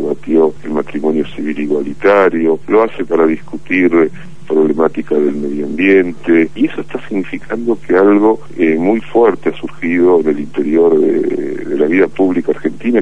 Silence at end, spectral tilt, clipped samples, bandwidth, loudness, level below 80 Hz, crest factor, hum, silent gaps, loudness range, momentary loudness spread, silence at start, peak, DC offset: 0 s; -7.5 dB/octave; under 0.1%; 9.4 kHz; -13 LUFS; -48 dBFS; 12 dB; none; none; 1 LU; 9 LU; 0 s; 0 dBFS; 5%